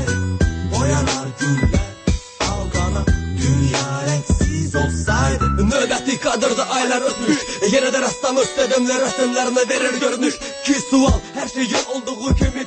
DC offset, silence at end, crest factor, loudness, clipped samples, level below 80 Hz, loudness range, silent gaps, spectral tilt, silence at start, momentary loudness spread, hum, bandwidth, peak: under 0.1%; 0 s; 14 dB; -19 LUFS; under 0.1%; -28 dBFS; 2 LU; none; -4.5 dB/octave; 0 s; 5 LU; none; 8.8 kHz; -4 dBFS